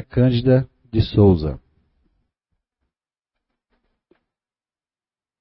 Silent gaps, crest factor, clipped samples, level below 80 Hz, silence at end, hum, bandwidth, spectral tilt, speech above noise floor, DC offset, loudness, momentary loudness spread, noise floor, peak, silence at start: none; 20 dB; under 0.1%; -40 dBFS; 3.85 s; none; 5.8 kHz; -12.5 dB/octave; over 74 dB; under 0.1%; -18 LUFS; 12 LU; under -90 dBFS; -4 dBFS; 0 s